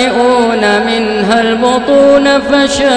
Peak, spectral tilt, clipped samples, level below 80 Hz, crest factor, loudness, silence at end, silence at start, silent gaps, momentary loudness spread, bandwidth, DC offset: 0 dBFS; -4 dB/octave; under 0.1%; -38 dBFS; 8 dB; -9 LUFS; 0 s; 0 s; none; 4 LU; 10 kHz; 0.5%